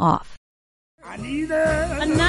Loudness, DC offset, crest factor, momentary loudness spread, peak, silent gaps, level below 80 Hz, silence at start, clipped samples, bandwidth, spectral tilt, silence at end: -23 LUFS; under 0.1%; 16 dB; 13 LU; -6 dBFS; 0.37-0.98 s; -38 dBFS; 0 s; under 0.1%; 11.5 kHz; -5.5 dB/octave; 0 s